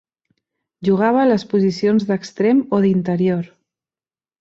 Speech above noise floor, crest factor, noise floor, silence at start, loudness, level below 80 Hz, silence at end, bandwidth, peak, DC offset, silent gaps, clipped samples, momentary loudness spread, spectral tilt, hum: over 74 dB; 16 dB; under -90 dBFS; 0.8 s; -17 LUFS; -60 dBFS; 0.95 s; 7.6 kHz; -2 dBFS; under 0.1%; none; under 0.1%; 8 LU; -7.5 dB/octave; none